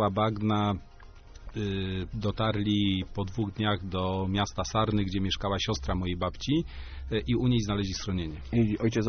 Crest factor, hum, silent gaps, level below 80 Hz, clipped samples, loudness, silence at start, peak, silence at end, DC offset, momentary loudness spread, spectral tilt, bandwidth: 16 dB; none; none; -42 dBFS; under 0.1%; -29 LUFS; 0 s; -12 dBFS; 0 s; under 0.1%; 7 LU; -5.5 dB/octave; 6.6 kHz